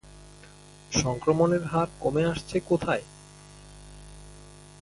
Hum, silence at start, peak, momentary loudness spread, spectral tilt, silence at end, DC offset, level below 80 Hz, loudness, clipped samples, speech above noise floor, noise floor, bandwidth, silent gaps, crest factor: 50 Hz at -45 dBFS; 0.05 s; -8 dBFS; 25 LU; -5.5 dB/octave; 0.15 s; under 0.1%; -50 dBFS; -26 LUFS; under 0.1%; 25 dB; -50 dBFS; 11.5 kHz; none; 20 dB